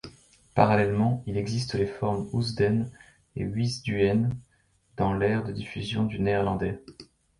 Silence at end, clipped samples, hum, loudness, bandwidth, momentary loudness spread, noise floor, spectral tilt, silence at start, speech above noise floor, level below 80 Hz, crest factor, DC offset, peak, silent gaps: 0.35 s; under 0.1%; none; -27 LUFS; 11.5 kHz; 12 LU; -65 dBFS; -7 dB/octave; 0.05 s; 39 dB; -50 dBFS; 22 dB; under 0.1%; -4 dBFS; none